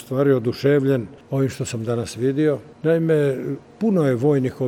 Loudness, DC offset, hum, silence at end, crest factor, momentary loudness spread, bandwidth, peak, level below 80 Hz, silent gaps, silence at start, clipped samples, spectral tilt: -21 LUFS; under 0.1%; none; 0 s; 14 dB; 7 LU; 15.5 kHz; -6 dBFS; -58 dBFS; none; 0 s; under 0.1%; -7.5 dB/octave